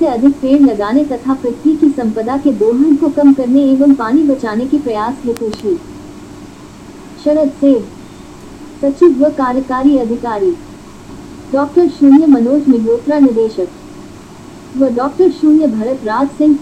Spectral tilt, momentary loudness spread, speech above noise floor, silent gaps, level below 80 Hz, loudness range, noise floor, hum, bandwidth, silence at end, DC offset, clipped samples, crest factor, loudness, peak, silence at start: -7 dB/octave; 21 LU; 22 dB; none; -44 dBFS; 6 LU; -33 dBFS; none; 9 kHz; 0 s; under 0.1%; under 0.1%; 12 dB; -12 LUFS; 0 dBFS; 0 s